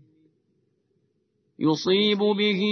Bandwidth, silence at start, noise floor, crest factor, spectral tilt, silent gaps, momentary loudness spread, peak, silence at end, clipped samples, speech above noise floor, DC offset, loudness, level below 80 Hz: 6.6 kHz; 1.6 s; -71 dBFS; 16 dB; -5.5 dB/octave; none; 5 LU; -10 dBFS; 0 s; under 0.1%; 49 dB; under 0.1%; -22 LUFS; -76 dBFS